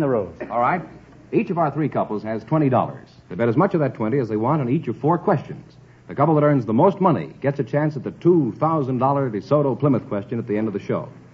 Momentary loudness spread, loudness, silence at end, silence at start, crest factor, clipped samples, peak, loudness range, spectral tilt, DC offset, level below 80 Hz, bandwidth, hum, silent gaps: 9 LU; -21 LUFS; 0.15 s; 0 s; 18 dB; under 0.1%; -2 dBFS; 3 LU; -10 dB/octave; under 0.1%; -58 dBFS; 6.4 kHz; none; none